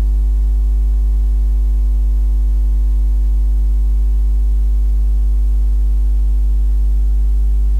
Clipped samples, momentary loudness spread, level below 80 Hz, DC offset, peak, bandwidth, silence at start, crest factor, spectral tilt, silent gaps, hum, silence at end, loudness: under 0.1%; 0 LU; -12 dBFS; under 0.1%; -8 dBFS; 1.1 kHz; 0 s; 4 dB; -8.5 dB/octave; none; none; 0 s; -17 LUFS